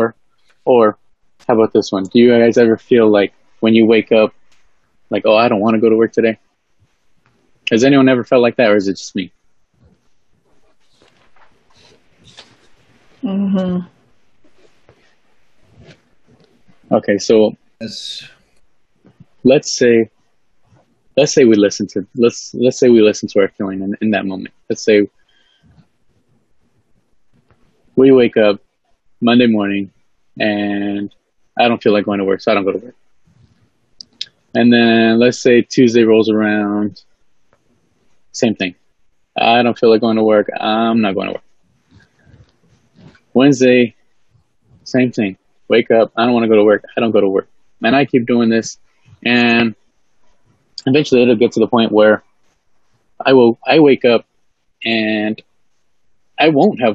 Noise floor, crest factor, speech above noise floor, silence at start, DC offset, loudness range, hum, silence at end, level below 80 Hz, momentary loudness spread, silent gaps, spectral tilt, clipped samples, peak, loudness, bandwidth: -67 dBFS; 16 dB; 55 dB; 0 s; 0.2%; 9 LU; none; 0 s; -60 dBFS; 14 LU; none; -5.5 dB/octave; under 0.1%; 0 dBFS; -13 LUFS; 8 kHz